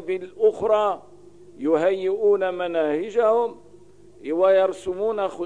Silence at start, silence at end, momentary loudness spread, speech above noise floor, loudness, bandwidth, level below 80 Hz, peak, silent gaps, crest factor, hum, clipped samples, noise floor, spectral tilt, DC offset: 0 s; 0 s; 10 LU; 29 dB; -22 LUFS; 10 kHz; -64 dBFS; -8 dBFS; none; 14 dB; none; under 0.1%; -50 dBFS; -6 dB/octave; 0.3%